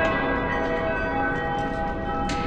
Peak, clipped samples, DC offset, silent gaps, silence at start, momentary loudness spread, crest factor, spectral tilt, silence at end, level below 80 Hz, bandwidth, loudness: -10 dBFS; under 0.1%; under 0.1%; none; 0 s; 3 LU; 14 dB; -6 dB/octave; 0 s; -36 dBFS; 10 kHz; -25 LUFS